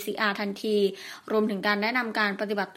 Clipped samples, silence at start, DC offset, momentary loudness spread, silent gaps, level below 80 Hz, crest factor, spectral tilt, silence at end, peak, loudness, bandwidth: under 0.1%; 0 s; under 0.1%; 4 LU; none; -78 dBFS; 18 dB; -5 dB/octave; 0 s; -8 dBFS; -27 LUFS; 16 kHz